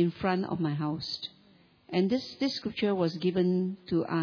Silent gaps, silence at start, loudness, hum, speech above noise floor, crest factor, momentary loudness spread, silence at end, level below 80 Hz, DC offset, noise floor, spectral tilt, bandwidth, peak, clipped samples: none; 0 s; -30 LUFS; none; 32 dB; 16 dB; 6 LU; 0 s; -64 dBFS; under 0.1%; -61 dBFS; -7.5 dB/octave; 5.4 kHz; -14 dBFS; under 0.1%